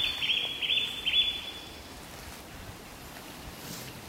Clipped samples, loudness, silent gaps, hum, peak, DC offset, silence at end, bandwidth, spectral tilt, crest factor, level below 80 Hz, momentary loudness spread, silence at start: under 0.1%; -28 LUFS; none; none; -16 dBFS; under 0.1%; 0 s; 16 kHz; -1.5 dB/octave; 18 dB; -56 dBFS; 19 LU; 0 s